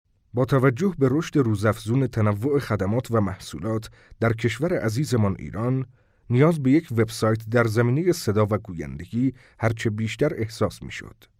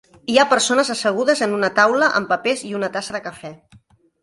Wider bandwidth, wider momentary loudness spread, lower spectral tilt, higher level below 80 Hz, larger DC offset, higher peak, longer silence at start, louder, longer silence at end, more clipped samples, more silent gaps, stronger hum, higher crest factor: first, 16 kHz vs 11.5 kHz; second, 9 LU vs 14 LU; first, -7 dB/octave vs -2.5 dB/octave; first, -52 dBFS vs -62 dBFS; neither; second, -6 dBFS vs 0 dBFS; about the same, 0.35 s vs 0.3 s; second, -24 LUFS vs -18 LUFS; second, 0.3 s vs 0.65 s; neither; neither; neither; about the same, 16 dB vs 20 dB